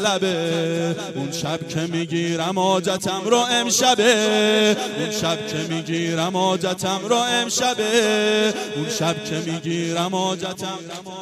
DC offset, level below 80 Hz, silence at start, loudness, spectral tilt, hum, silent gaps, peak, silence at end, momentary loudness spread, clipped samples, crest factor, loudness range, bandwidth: under 0.1%; -64 dBFS; 0 s; -20 LUFS; -3.5 dB/octave; none; none; -2 dBFS; 0 s; 9 LU; under 0.1%; 18 dB; 4 LU; 15.5 kHz